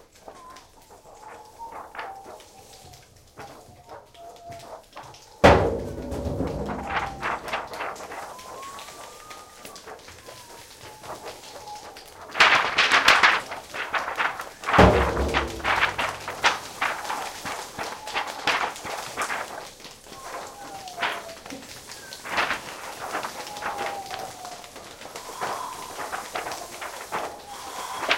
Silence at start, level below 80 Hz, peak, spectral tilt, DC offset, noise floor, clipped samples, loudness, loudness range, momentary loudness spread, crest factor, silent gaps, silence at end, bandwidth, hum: 0.25 s; -42 dBFS; 0 dBFS; -3.5 dB/octave; under 0.1%; -50 dBFS; under 0.1%; -24 LUFS; 20 LU; 26 LU; 26 dB; none; 0 s; 17 kHz; none